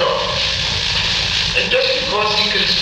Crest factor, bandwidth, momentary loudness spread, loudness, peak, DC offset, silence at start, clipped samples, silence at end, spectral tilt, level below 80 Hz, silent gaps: 12 dB; 15 kHz; 3 LU; -15 LUFS; -4 dBFS; under 0.1%; 0 s; under 0.1%; 0 s; -2 dB/octave; -36 dBFS; none